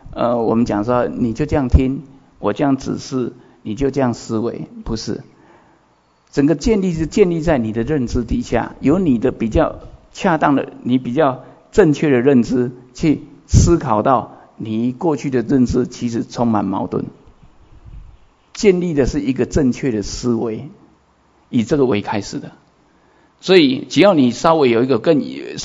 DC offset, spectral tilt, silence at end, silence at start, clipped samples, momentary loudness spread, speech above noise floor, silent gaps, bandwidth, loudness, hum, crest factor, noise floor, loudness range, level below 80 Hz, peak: under 0.1%; -6.5 dB/octave; 0 s; 0.05 s; under 0.1%; 12 LU; 40 dB; none; 7.8 kHz; -17 LUFS; none; 18 dB; -56 dBFS; 6 LU; -32 dBFS; 0 dBFS